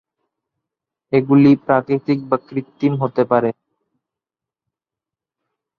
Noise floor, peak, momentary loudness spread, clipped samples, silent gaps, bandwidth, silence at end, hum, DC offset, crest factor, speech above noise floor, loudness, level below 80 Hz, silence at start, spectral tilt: -88 dBFS; -2 dBFS; 9 LU; under 0.1%; none; 4.9 kHz; 2.25 s; none; under 0.1%; 18 dB; 72 dB; -17 LUFS; -62 dBFS; 1.1 s; -10 dB/octave